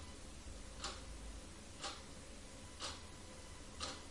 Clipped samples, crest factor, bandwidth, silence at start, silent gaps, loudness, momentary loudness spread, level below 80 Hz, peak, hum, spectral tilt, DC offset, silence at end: under 0.1%; 20 dB; 11.5 kHz; 0 s; none; -50 LUFS; 7 LU; -56 dBFS; -30 dBFS; none; -2.5 dB/octave; under 0.1%; 0 s